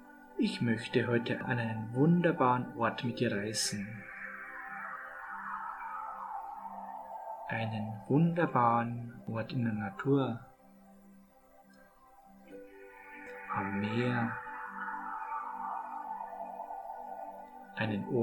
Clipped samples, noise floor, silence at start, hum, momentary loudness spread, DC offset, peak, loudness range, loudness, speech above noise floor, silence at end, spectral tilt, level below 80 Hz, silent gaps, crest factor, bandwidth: under 0.1%; -61 dBFS; 0 s; none; 16 LU; under 0.1%; -14 dBFS; 10 LU; -34 LUFS; 29 dB; 0 s; -6 dB/octave; -70 dBFS; none; 20 dB; 18 kHz